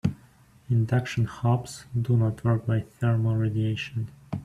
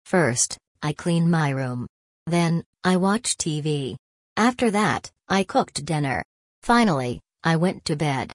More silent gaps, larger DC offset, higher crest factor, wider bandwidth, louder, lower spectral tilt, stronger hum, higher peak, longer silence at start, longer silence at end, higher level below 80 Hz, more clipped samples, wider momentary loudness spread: second, none vs 0.67-0.75 s, 1.89-2.26 s, 2.66-2.73 s, 3.99-4.36 s, 6.25-6.62 s; neither; about the same, 16 dB vs 16 dB; about the same, 11.5 kHz vs 11 kHz; second, -27 LUFS vs -23 LUFS; first, -7.5 dB/octave vs -5 dB/octave; neither; second, -10 dBFS vs -6 dBFS; about the same, 0.05 s vs 0.05 s; about the same, 0 s vs 0 s; about the same, -54 dBFS vs -54 dBFS; neither; second, 8 LU vs 11 LU